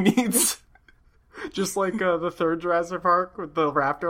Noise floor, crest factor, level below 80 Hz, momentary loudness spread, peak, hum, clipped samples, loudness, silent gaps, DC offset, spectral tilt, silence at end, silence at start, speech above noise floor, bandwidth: -57 dBFS; 18 dB; -58 dBFS; 9 LU; -6 dBFS; none; under 0.1%; -24 LUFS; none; under 0.1%; -3.5 dB/octave; 0 s; 0 s; 34 dB; 16.5 kHz